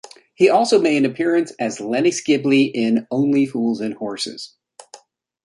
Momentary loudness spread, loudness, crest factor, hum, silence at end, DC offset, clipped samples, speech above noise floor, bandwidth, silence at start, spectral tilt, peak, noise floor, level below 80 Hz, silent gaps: 11 LU; -18 LUFS; 16 dB; none; 0.5 s; under 0.1%; under 0.1%; 29 dB; 11.5 kHz; 0.4 s; -5 dB/octave; -2 dBFS; -47 dBFS; -68 dBFS; none